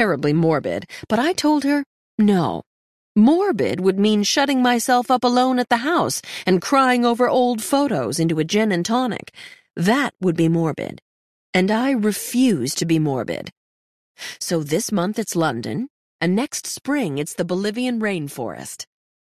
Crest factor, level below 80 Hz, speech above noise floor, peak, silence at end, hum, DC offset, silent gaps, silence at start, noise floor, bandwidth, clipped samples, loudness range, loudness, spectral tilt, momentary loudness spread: 16 dB; -62 dBFS; over 71 dB; -4 dBFS; 0.55 s; none; under 0.1%; 1.86-2.18 s, 2.66-3.15 s, 11.02-11.53 s, 13.52-14.15 s, 15.90-16.19 s; 0 s; under -90 dBFS; 14.5 kHz; under 0.1%; 6 LU; -20 LUFS; -5 dB/octave; 13 LU